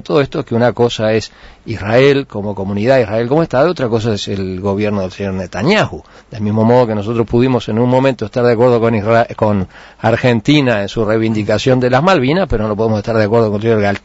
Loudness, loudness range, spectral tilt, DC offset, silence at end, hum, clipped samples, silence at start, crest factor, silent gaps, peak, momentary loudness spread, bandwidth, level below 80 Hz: -14 LUFS; 3 LU; -7 dB/octave; under 0.1%; 0.05 s; none; under 0.1%; 0.05 s; 12 dB; none; 0 dBFS; 9 LU; 8 kHz; -38 dBFS